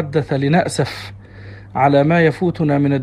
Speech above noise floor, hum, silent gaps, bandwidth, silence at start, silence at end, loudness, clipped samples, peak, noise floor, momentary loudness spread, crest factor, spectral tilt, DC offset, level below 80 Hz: 21 dB; none; none; 12 kHz; 0 s; 0 s; -16 LUFS; under 0.1%; -2 dBFS; -36 dBFS; 16 LU; 16 dB; -7 dB/octave; under 0.1%; -48 dBFS